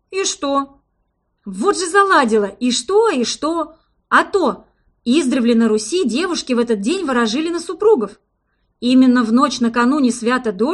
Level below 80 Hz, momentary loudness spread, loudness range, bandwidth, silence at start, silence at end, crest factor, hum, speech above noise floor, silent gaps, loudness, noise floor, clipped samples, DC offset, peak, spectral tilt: -56 dBFS; 9 LU; 1 LU; 11.5 kHz; 0.1 s; 0 s; 16 dB; none; 52 dB; none; -16 LUFS; -67 dBFS; under 0.1%; under 0.1%; 0 dBFS; -3.5 dB/octave